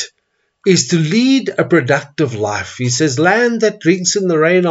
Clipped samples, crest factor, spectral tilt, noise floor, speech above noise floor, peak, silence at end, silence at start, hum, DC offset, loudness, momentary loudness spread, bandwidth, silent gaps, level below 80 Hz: under 0.1%; 14 dB; -4.5 dB/octave; -66 dBFS; 53 dB; 0 dBFS; 0 s; 0 s; none; under 0.1%; -14 LUFS; 7 LU; 8 kHz; none; -60 dBFS